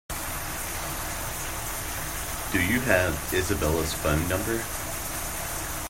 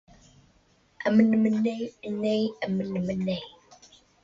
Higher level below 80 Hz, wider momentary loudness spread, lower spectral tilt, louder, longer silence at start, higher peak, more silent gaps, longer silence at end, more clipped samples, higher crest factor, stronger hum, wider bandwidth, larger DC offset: first, -40 dBFS vs -62 dBFS; second, 8 LU vs 12 LU; second, -3.5 dB/octave vs -7.5 dB/octave; about the same, -28 LUFS vs -26 LUFS; second, 0.1 s vs 1 s; about the same, -6 dBFS vs -8 dBFS; neither; second, 0 s vs 0.75 s; neither; about the same, 22 dB vs 20 dB; neither; first, 16.5 kHz vs 7.6 kHz; neither